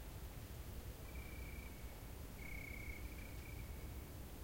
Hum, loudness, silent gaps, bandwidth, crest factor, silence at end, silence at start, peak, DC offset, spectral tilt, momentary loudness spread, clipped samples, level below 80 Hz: none; -52 LUFS; none; 16.5 kHz; 14 dB; 0 s; 0 s; -36 dBFS; under 0.1%; -5 dB/octave; 4 LU; under 0.1%; -54 dBFS